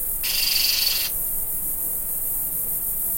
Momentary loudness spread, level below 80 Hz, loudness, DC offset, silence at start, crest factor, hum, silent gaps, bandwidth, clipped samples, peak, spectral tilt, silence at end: 5 LU; -42 dBFS; -21 LUFS; under 0.1%; 0 s; 16 dB; none; none; 16.5 kHz; under 0.1%; -8 dBFS; 1 dB/octave; 0 s